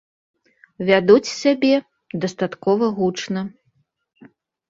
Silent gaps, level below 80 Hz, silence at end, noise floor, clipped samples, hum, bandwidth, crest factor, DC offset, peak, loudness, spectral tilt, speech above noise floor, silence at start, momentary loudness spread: none; -62 dBFS; 1.2 s; -66 dBFS; under 0.1%; none; 7.8 kHz; 20 dB; under 0.1%; 0 dBFS; -19 LUFS; -5.5 dB/octave; 48 dB; 0.8 s; 12 LU